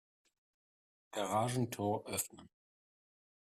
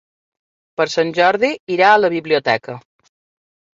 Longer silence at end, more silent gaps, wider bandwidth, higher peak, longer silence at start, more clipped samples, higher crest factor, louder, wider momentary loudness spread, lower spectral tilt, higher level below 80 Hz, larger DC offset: about the same, 0.95 s vs 1 s; second, none vs 1.60-1.67 s; first, 15.5 kHz vs 7.8 kHz; second, -22 dBFS vs -2 dBFS; first, 1.15 s vs 0.8 s; neither; about the same, 20 dB vs 18 dB; second, -38 LUFS vs -16 LUFS; second, 8 LU vs 16 LU; about the same, -4.5 dB/octave vs -4.5 dB/octave; second, -76 dBFS vs -66 dBFS; neither